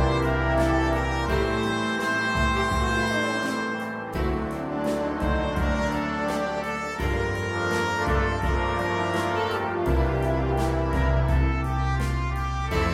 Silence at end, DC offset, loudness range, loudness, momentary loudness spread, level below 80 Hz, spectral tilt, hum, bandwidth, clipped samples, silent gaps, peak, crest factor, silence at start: 0 s; under 0.1%; 3 LU; -25 LUFS; 5 LU; -30 dBFS; -6 dB/octave; none; 14.5 kHz; under 0.1%; none; -10 dBFS; 14 dB; 0 s